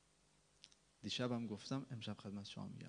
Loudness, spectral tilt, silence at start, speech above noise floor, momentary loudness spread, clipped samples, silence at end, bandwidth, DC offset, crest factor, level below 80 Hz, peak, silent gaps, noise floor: -46 LUFS; -5.5 dB/octave; 0.65 s; 29 dB; 23 LU; under 0.1%; 0 s; 10 kHz; under 0.1%; 22 dB; -76 dBFS; -26 dBFS; none; -75 dBFS